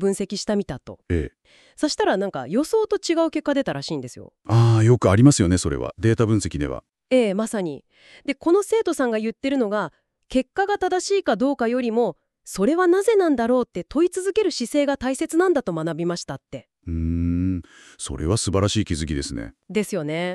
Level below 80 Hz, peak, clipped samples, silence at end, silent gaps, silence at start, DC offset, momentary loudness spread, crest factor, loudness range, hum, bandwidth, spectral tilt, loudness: -42 dBFS; -4 dBFS; under 0.1%; 0 s; none; 0 s; under 0.1%; 14 LU; 18 dB; 6 LU; none; 13 kHz; -6 dB/octave; -22 LUFS